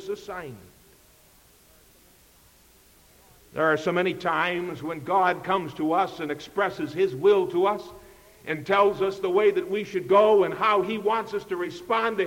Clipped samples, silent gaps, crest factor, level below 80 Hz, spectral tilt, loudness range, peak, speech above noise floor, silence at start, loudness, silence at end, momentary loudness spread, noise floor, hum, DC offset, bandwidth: under 0.1%; none; 16 dB; -62 dBFS; -5.5 dB/octave; 7 LU; -8 dBFS; 32 dB; 0 s; -24 LUFS; 0 s; 13 LU; -57 dBFS; none; under 0.1%; 17 kHz